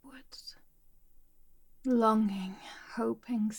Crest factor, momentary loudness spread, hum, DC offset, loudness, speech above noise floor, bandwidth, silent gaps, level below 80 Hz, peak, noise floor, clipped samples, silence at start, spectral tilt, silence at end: 20 dB; 21 LU; none; under 0.1%; -31 LUFS; 29 dB; 17.5 kHz; none; -62 dBFS; -14 dBFS; -59 dBFS; under 0.1%; 0.05 s; -6.5 dB/octave; 0 s